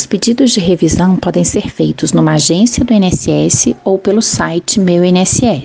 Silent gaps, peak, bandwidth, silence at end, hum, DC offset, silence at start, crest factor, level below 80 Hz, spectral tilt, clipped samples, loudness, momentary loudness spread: none; 0 dBFS; 10 kHz; 0 s; none; under 0.1%; 0 s; 10 dB; -34 dBFS; -4.5 dB/octave; under 0.1%; -11 LUFS; 4 LU